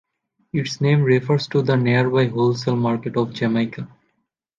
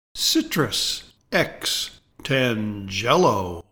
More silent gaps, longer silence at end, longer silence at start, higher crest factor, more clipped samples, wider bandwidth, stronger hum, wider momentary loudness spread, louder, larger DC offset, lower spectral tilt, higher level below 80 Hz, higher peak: neither; first, 0.7 s vs 0.1 s; first, 0.55 s vs 0.15 s; about the same, 16 dB vs 20 dB; neither; second, 7.6 kHz vs 19 kHz; neither; about the same, 9 LU vs 9 LU; about the same, -20 LUFS vs -22 LUFS; neither; first, -7 dB/octave vs -3.5 dB/octave; second, -60 dBFS vs -50 dBFS; about the same, -4 dBFS vs -4 dBFS